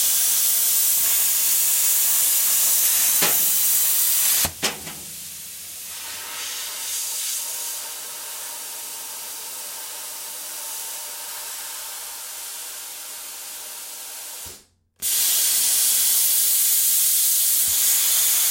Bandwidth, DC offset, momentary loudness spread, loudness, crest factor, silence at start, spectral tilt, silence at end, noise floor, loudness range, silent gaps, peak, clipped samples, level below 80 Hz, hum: 16.5 kHz; under 0.1%; 16 LU; -17 LUFS; 16 dB; 0 s; 2 dB/octave; 0 s; -50 dBFS; 14 LU; none; -6 dBFS; under 0.1%; -64 dBFS; none